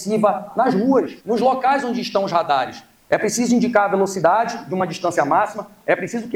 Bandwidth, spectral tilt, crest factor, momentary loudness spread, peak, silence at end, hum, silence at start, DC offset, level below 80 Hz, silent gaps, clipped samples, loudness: 16 kHz; -5 dB/octave; 18 dB; 7 LU; -2 dBFS; 0 s; none; 0 s; under 0.1%; -62 dBFS; none; under 0.1%; -19 LUFS